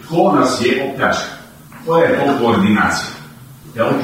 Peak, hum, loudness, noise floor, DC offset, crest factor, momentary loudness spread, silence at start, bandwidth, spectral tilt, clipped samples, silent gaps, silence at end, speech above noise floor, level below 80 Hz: -2 dBFS; none; -15 LUFS; -37 dBFS; under 0.1%; 12 dB; 16 LU; 0 s; 16 kHz; -5 dB/octave; under 0.1%; none; 0 s; 23 dB; -50 dBFS